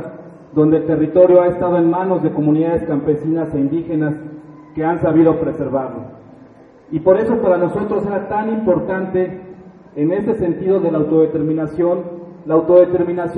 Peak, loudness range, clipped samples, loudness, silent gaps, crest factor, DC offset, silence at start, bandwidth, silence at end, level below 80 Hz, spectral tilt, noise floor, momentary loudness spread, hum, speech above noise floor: 0 dBFS; 4 LU; under 0.1%; -16 LUFS; none; 16 dB; under 0.1%; 0 s; 4 kHz; 0 s; -48 dBFS; -11 dB/octave; -43 dBFS; 12 LU; none; 28 dB